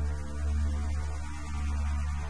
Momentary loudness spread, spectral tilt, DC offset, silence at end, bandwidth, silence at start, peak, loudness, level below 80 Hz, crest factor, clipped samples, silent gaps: 6 LU; -6 dB/octave; 1%; 0 s; 10.5 kHz; 0 s; -20 dBFS; -34 LUFS; -32 dBFS; 10 dB; under 0.1%; none